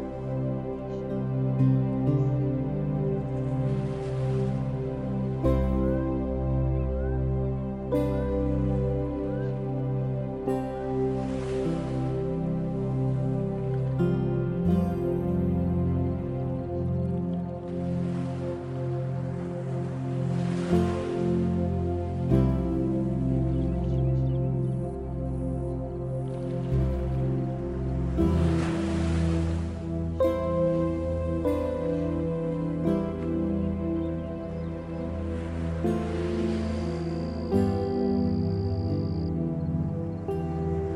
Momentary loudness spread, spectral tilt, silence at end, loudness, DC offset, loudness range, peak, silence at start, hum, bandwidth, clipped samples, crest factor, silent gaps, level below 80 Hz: 6 LU; -9.5 dB/octave; 0 s; -28 LUFS; under 0.1%; 3 LU; -8 dBFS; 0 s; none; 10 kHz; under 0.1%; 18 dB; none; -38 dBFS